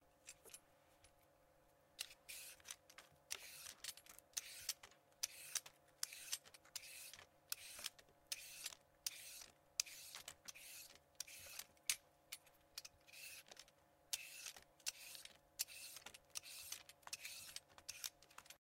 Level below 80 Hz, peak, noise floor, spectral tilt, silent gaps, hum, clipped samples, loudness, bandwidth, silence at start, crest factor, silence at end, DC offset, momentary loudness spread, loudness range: -84 dBFS; -18 dBFS; -74 dBFS; 2 dB/octave; none; none; under 0.1%; -51 LUFS; 16 kHz; 0 s; 36 dB; 0.05 s; under 0.1%; 14 LU; 4 LU